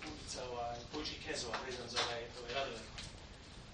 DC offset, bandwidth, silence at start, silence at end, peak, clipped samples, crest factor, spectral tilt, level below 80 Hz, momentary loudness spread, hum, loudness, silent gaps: under 0.1%; 9.4 kHz; 0 s; 0 s; -22 dBFS; under 0.1%; 22 dB; -2.5 dB/octave; -58 dBFS; 12 LU; none; -42 LUFS; none